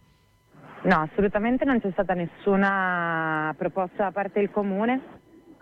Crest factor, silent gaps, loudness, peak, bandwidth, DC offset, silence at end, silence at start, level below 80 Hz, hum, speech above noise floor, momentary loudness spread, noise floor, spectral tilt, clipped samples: 16 dB; none; -25 LUFS; -10 dBFS; 5.8 kHz; under 0.1%; 0.45 s; 0.65 s; -52 dBFS; none; 36 dB; 6 LU; -61 dBFS; -8.5 dB/octave; under 0.1%